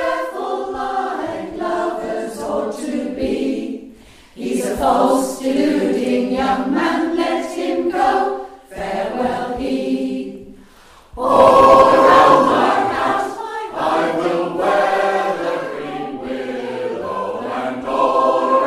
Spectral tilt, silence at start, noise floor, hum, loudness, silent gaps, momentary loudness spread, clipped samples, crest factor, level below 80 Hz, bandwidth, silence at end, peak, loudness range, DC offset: -5 dB/octave; 0 s; -45 dBFS; none; -17 LUFS; none; 15 LU; under 0.1%; 16 dB; -46 dBFS; 15 kHz; 0 s; 0 dBFS; 10 LU; under 0.1%